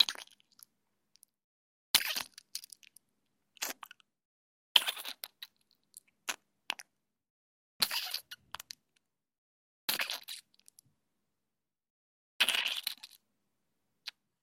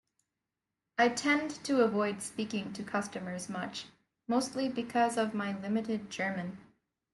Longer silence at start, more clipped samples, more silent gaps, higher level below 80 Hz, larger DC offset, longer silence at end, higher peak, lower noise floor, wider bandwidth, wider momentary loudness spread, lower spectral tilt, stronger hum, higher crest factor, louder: second, 0 s vs 1 s; neither; first, 1.44-1.94 s, 4.25-4.75 s, 7.30-7.80 s, 9.38-9.88 s, 11.90-12.40 s vs none; second, -84 dBFS vs -74 dBFS; neither; second, 0.35 s vs 0.5 s; first, -4 dBFS vs -14 dBFS; about the same, under -90 dBFS vs -89 dBFS; first, 16.5 kHz vs 12 kHz; first, 22 LU vs 11 LU; second, 2 dB/octave vs -4.5 dB/octave; neither; first, 36 dB vs 20 dB; about the same, -33 LUFS vs -33 LUFS